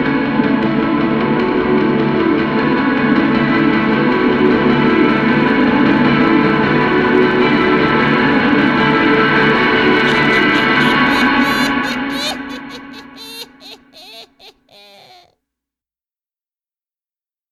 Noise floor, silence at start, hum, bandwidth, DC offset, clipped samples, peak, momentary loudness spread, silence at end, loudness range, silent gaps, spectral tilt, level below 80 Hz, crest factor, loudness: under -90 dBFS; 0 s; none; 13 kHz; under 0.1%; under 0.1%; 0 dBFS; 8 LU; 3 s; 7 LU; none; -6 dB/octave; -42 dBFS; 14 dB; -13 LUFS